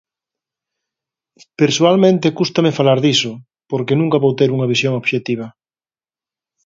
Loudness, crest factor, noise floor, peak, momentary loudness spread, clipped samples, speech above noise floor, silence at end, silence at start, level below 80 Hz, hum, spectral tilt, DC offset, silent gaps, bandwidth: -15 LUFS; 18 dB; under -90 dBFS; 0 dBFS; 11 LU; under 0.1%; over 75 dB; 1.15 s; 1.6 s; -62 dBFS; none; -5.5 dB/octave; under 0.1%; none; 7.8 kHz